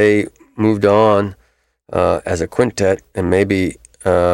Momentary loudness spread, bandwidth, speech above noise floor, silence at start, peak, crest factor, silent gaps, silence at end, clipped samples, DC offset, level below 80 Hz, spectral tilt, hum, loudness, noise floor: 11 LU; 13 kHz; 44 dB; 0 s; 0 dBFS; 14 dB; none; 0 s; under 0.1%; under 0.1%; -42 dBFS; -6.5 dB/octave; none; -16 LUFS; -58 dBFS